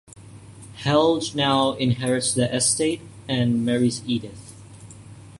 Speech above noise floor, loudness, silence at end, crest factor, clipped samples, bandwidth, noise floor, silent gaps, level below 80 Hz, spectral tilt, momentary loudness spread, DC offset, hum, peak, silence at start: 22 dB; -22 LUFS; 0.05 s; 18 dB; under 0.1%; 11.5 kHz; -43 dBFS; none; -54 dBFS; -4.5 dB/octave; 19 LU; under 0.1%; none; -6 dBFS; 0.15 s